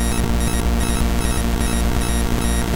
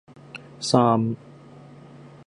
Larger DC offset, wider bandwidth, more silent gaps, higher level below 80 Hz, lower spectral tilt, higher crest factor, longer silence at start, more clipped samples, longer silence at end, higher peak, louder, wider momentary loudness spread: neither; first, 17 kHz vs 11 kHz; neither; first, -20 dBFS vs -64 dBFS; second, -4.5 dB/octave vs -6 dB/octave; second, 10 dB vs 22 dB; second, 0 s vs 0.35 s; neither; second, 0 s vs 0.2 s; second, -8 dBFS vs -4 dBFS; about the same, -20 LUFS vs -22 LUFS; second, 1 LU vs 23 LU